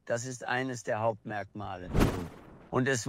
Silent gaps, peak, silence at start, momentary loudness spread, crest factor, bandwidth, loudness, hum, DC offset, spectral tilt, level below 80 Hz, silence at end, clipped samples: none; -12 dBFS; 0.05 s; 11 LU; 20 dB; 16 kHz; -33 LUFS; none; under 0.1%; -5 dB/octave; -42 dBFS; 0 s; under 0.1%